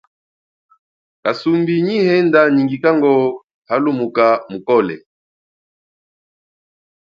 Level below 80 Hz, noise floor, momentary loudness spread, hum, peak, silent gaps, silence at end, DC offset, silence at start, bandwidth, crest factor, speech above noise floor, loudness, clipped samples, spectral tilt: -64 dBFS; under -90 dBFS; 10 LU; none; 0 dBFS; 3.44-3.48 s, 3.54-3.62 s; 2.05 s; under 0.1%; 1.25 s; 7.2 kHz; 18 dB; over 76 dB; -15 LUFS; under 0.1%; -8 dB/octave